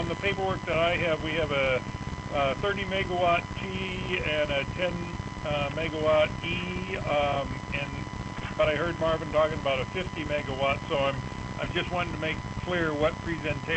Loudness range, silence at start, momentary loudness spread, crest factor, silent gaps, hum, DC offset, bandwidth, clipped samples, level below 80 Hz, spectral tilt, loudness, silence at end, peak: 2 LU; 0 s; 8 LU; 16 dB; none; none; under 0.1%; 8.6 kHz; under 0.1%; -44 dBFS; -5.5 dB/octave; -28 LUFS; 0 s; -12 dBFS